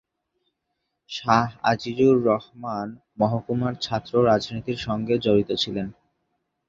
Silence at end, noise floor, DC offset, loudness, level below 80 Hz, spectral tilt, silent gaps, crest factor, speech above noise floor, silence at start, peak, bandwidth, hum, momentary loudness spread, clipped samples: 0.75 s; -78 dBFS; under 0.1%; -23 LUFS; -54 dBFS; -6.5 dB/octave; none; 22 dB; 55 dB; 1.1 s; -2 dBFS; 7.6 kHz; none; 12 LU; under 0.1%